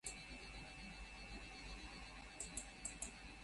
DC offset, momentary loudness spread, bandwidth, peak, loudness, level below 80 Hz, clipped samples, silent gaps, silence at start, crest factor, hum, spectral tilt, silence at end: under 0.1%; 5 LU; 11.5 kHz; -30 dBFS; -52 LUFS; -60 dBFS; under 0.1%; none; 0.05 s; 24 dB; none; -2 dB/octave; 0 s